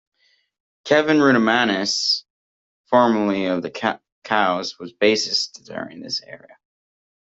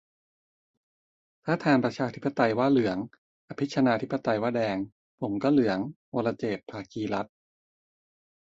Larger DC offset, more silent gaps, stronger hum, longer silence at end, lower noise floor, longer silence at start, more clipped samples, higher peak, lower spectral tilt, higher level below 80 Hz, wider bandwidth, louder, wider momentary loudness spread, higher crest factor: neither; second, 2.30-2.84 s, 4.12-4.22 s vs 3.18-3.48 s, 4.92-5.18 s, 5.96-6.12 s; neither; second, 0.95 s vs 1.2 s; about the same, under -90 dBFS vs under -90 dBFS; second, 0.85 s vs 1.45 s; neither; first, -2 dBFS vs -8 dBFS; second, -3.5 dB/octave vs -7 dB/octave; about the same, -66 dBFS vs -66 dBFS; about the same, 8 kHz vs 7.8 kHz; first, -19 LUFS vs -28 LUFS; about the same, 15 LU vs 13 LU; about the same, 20 dB vs 20 dB